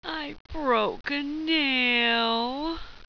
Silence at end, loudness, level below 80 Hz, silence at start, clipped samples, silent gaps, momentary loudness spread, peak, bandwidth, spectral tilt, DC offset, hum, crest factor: 0.05 s; -25 LUFS; -48 dBFS; 0 s; under 0.1%; 0.40-0.45 s; 12 LU; -12 dBFS; 5.4 kHz; -4.5 dB/octave; under 0.1%; none; 16 dB